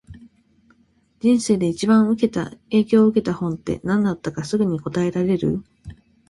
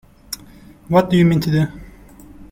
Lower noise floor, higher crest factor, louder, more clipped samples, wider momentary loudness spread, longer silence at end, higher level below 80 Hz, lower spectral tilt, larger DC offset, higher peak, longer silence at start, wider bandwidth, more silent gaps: first, -60 dBFS vs -43 dBFS; about the same, 16 dB vs 18 dB; second, -20 LUFS vs -16 LUFS; neither; second, 9 LU vs 18 LU; first, 0.35 s vs 0.05 s; second, -50 dBFS vs -44 dBFS; about the same, -6.5 dB/octave vs -7 dB/octave; neither; second, -4 dBFS vs 0 dBFS; second, 0.1 s vs 0.3 s; second, 11.5 kHz vs 16 kHz; neither